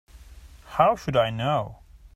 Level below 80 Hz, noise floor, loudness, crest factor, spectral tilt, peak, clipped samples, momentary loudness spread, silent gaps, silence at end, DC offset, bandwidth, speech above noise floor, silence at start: -48 dBFS; -47 dBFS; -24 LUFS; 20 dB; -6.5 dB/octave; -6 dBFS; under 0.1%; 10 LU; none; 0.1 s; under 0.1%; 15.5 kHz; 24 dB; 0.15 s